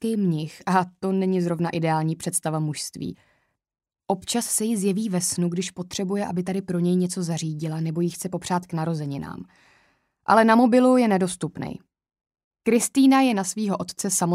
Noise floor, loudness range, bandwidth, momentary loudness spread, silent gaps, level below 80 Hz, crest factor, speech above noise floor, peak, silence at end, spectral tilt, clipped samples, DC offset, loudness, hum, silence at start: -65 dBFS; 5 LU; 16 kHz; 13 LU; 12.44-12.51 s; -62 dBFS; 20 dB; 42 dB; -4 dBFS; 0 s; -5 dB/octave; under 0.1%; under 0.1%; -23 LUFS; none; 0 s